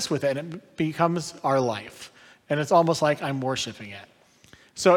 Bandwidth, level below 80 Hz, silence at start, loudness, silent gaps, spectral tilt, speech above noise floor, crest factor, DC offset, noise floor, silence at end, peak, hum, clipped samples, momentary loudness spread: 17 kHz; -66 dBFS; 0 s; -25 LUFS; none; -5 dB/octave; 30 dB; 20 dB; under 0.1%; -55 dBFS; 0 s; -6 dBFS; none; under 0.1%; 21 LU